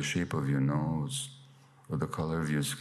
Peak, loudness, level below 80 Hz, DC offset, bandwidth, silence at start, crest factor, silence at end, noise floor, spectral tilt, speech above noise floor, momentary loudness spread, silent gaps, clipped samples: -20 dBFS; -32 LUFS; -58 dBFS; under 0.1%; 14 kHz; 0 s; 14 dB; 0 s; -57 dBFS; -5.5 dB/octave; 26 dB; 8 LU; none; under 0.1%